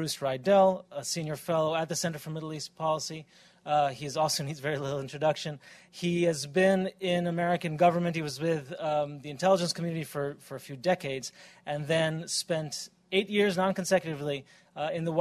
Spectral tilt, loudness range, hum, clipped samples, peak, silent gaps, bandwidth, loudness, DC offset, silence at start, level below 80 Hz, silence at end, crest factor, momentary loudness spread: -4.5 dB/octave; 3 LU; none; under 0.1%; -12 dBFS; none; 14 kHz; -29 LUFS; under 0.1%; 0 s; -68 dBFS; 0 s; 18 dB; 12 LU